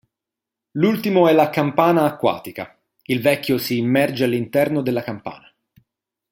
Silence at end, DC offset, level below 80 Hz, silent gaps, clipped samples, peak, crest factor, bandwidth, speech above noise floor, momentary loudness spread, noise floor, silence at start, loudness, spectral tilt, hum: 0.95 s; under 0.1%; -62 dBFS; none; under 0.1%; -2 dBFS; 18 dB; 17 kHz; 67 dB; 17 LU; -86 dBFS; 0.75 s; -19 LUFS; -6.5 dB/octave; none